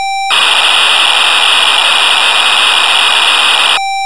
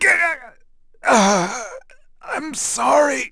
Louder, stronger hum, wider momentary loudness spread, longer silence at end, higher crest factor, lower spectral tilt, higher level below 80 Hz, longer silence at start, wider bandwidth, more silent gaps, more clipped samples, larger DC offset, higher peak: first, -6 LUFS vs -18 LUFS; neither; second, 1 LU vs 15 LU; about the same, 0 s vs 0 s; second, 8 dB vs 18 dB; second, 2.5 dB/octave vs -3 dB/octave; second, -66 dBFS vs -52 dBFS; about the same, 0 s vs 0 s; about the same, 11 kHz vs 11 kHz; neither; neither; first, 4% vs under 0.1%; about the same, 0 dBFS vs -2 dBFS